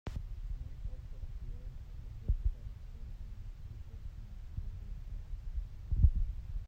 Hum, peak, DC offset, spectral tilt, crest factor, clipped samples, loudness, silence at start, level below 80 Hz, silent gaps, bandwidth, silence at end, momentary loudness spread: none; -14 dBFS; under 0.1%; -8.5 dB/octave; 24 dB; under 0.1%; -42 LUFS; 0.05 s; -38 dBFS; none; 6 kHz; 0 s; 17 LU